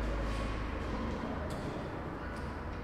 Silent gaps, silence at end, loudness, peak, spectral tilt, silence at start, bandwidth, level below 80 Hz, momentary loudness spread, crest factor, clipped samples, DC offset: none; 0 s; -39 LUFS; -24 dBFS; -6.5 dB/octave; 0 s; 12 kHz; -42 dBFS; 4 LU; 12 dB; under 0.1%; under 0.1%